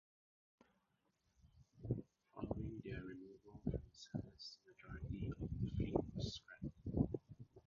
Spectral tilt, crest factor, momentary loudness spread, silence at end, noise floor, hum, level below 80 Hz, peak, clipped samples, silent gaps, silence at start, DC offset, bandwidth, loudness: -7 dB/octave; 24 dB; 15 LU; 0.05 s; -83 dBFS; none; -56 dBFS; -22 dBFS; under 0.1%; none; 1.45 s; under 0.1%; 7.2 kHz; -47 LUFS